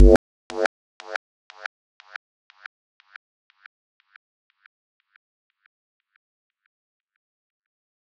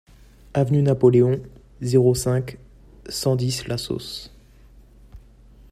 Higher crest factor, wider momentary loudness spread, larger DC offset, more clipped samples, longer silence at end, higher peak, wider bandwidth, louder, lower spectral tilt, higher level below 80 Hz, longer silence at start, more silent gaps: first, 26 dB vs 20 dB; first, 26 LU vs 15 LU; neither; neither; first, 6.9 s vs 0.55 s; first, 0 dBFS vs -4 dBFS; second, 10.5 kHz vs 14.5 kHz; second, -25 LUFS vs -21 LUFS; about the same, -7 dB/octave vs -6.5 dB/octave; first, -30 dBFS vs -48 dBFS; second, 0 s vs 0.55 s; first, 0.16-0.50 s, 0.66-1.00 s vs none